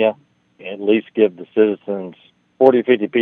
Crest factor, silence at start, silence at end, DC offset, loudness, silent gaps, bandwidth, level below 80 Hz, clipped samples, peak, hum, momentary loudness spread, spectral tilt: 18 dB; 0 s; 0 s; under 0.1%; -17 LUFS; none; 4 kHz; -72 dBFS; under 0.1%; 0 dBFS; none; 16 LU; -8.5 dB/octave